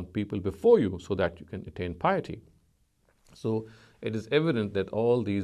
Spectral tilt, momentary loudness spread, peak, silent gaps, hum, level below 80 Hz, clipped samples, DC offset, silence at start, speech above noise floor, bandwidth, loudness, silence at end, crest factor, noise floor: -7.5 dB/octave; 15 LU; -8 dBFS; none; none; -52 dBFS; under 0.1%; under 0.1%; 0 s; 41 dB; 10 kHz; -28 LUFS; 0 s; 20 dB; -68 dBFS